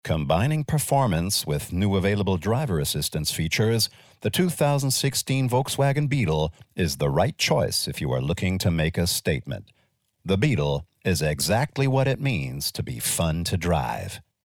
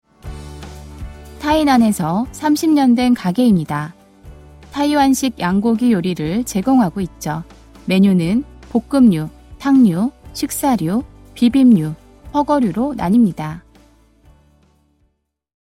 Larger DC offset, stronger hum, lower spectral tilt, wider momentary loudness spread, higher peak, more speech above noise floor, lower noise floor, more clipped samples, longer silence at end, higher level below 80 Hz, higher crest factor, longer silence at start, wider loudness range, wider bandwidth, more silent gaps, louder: neither; neither; about the same, -5 dB/octave vs -6 dB/octave; second, 6 LU vs 20 LU; second, -8 dBFS vs -2 dBFS; second, 33 dB vs 52 dB; second, -57 dBFS vs -67 dBFS; neither; second, 0.25 s vs 2 s; about the same, -42 dBFS vs -42 dBFS; about the same, 16 dB vs 14 dB; second, 0.05 s vs 0.25 s; about the same, 2 LU vs 2 LU; first, 19 kHz vs 16 kHz; neither; second, -24 LUFS vs -16 LUFS